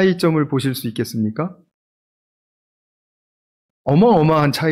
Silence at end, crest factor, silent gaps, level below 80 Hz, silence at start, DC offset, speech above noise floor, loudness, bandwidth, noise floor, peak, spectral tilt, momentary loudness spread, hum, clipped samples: 0 s; 14 dB; 1.74-3.84 s; -54 dBFS; 0 s; under 0.1%; over 74 dB; -17 LUFS; 16 kHz; under -90 dBFS; -4 dBFS; -7 dB/octave; 13 LU; none; under 0.1%